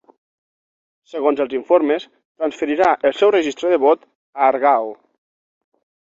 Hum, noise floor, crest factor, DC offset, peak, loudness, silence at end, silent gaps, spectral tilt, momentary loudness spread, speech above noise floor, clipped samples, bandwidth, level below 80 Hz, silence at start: none; under -90 dBFS; 18 dB; under 0.1%; -2 dBFS; -18 LUFS; 1.2 s; 2.25-2.35 s, 4.15-4.33 s; -4 dB/octave; 10 LU; over 73 dB; under 0.1%; 7.8 kHz; -64 dBFS; 1.15 s